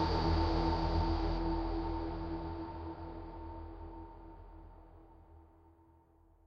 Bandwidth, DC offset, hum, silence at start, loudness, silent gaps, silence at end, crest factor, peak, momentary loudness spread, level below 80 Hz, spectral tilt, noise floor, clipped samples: 6.6 kHz; under 0.1%; none; 0 s; -37 LUFS; none; 1 s; 18 dB; -20 dBFS; 22 LU; -42 dBFS; -8 dB/octave; -65 dBFS; under 0.1%